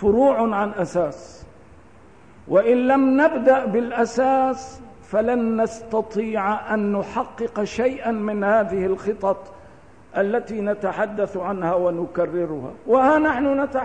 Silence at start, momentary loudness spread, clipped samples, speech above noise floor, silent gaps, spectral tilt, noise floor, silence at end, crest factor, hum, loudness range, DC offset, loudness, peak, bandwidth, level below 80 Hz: 0 s; 9 LU; under 0.1%; 28 dB; none; -6.5 dB/octave; -49 dBFS; 0 s; 16 dB; none; 5 LU; 0.3%; -21 LUFS; -6 dBFS; 9.4 kHz; -52 dBFS